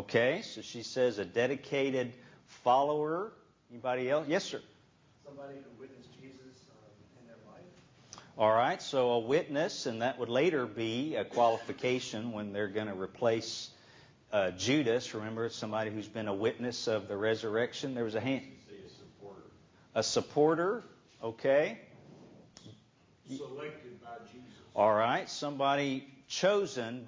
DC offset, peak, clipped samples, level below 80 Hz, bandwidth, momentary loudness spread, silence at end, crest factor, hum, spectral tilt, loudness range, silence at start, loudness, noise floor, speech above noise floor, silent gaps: under 0.1%; -14 dBFS; under 0.1%; -72 dBFS; 7.6 kHz; 21 LU; 0 s; 20 dB; none; -4.5 dB/octave; 7 LU; 0 s; -32 LUFS; -65 dBFS; 32 dB; none